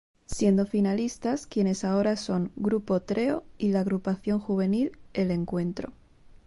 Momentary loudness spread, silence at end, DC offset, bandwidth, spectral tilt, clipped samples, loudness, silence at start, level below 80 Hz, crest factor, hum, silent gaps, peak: 6 LU; 0.55 s; under 0.1%; 11.5 kHz; -7 dB/octave; under 0.1%; -27 LUFS; 0.3 s; -54 dBFS; 16 dB; none; none; -10 dBFS